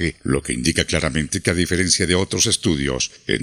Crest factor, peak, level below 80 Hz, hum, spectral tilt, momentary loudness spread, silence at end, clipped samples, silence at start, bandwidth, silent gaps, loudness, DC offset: 20 dB; 0 dBFS; -38 dBFS; none; -3.5 dB/octave; 5 LU; 0 s; under 0.1%; 0 s; 15.5 kHz; none; -19 LUFS; under 0.1%